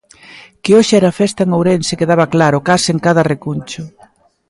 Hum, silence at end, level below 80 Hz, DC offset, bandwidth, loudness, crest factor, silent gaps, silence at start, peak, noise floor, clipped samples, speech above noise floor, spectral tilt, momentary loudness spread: none; 0.6 s; -50 dBFS; under 0.1%; 11.5 kHz; -13 LUFS; 14 dB; none; 0.35 s; 0 dBFS; -48 dBFS; under 0.1%; 36 dB; -5.5 dB/octave; 13 LU